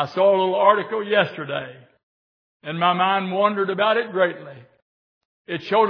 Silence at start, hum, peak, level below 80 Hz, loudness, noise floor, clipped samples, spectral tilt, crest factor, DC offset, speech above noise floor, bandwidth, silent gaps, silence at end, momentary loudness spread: 0 s; none; -2 dBFS; -76 dBFS; -20 LUFS; under -90 dBFS; under 0.1%; -7 dB/octave; 20 dB; under 0.1%; over 70 dB; 5.4 kHz; 2.03-2.60 s, 4.82-5.45 s; 0 s; 14 LU